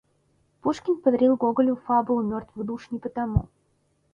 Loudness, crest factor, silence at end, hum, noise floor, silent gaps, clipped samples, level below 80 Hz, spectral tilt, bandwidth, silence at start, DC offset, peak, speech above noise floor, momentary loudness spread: -25 LUFS; 18 dB; 0.7 s; none; -68 dBFS; none; under 0.1%; -44 dBFS; -9 dB/octave; 7.4 kHz; 0.65 s; under 0.1%; -8 dBFS; 44 dB; 12 LU